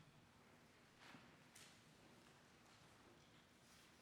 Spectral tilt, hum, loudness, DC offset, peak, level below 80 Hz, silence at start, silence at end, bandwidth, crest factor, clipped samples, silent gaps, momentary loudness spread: -3.5 dB/octave; none; -67 LUFS; under 0.1%; -46 dBFS; -86 dBFS; 0 s; 0 s; 17.5 kHz; 22 dB; under 0.1%; none; 5 LU